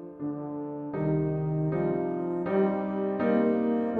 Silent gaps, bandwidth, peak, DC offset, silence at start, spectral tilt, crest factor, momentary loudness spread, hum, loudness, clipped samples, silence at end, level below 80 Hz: none; 4.4 kHz; -14 dBFS; under 0.1%; 0 s; -11.5 dB/octave; 14 dB; 10 LU; none; -29 LUFS; under 0.1%; 0 s; -56 dBFS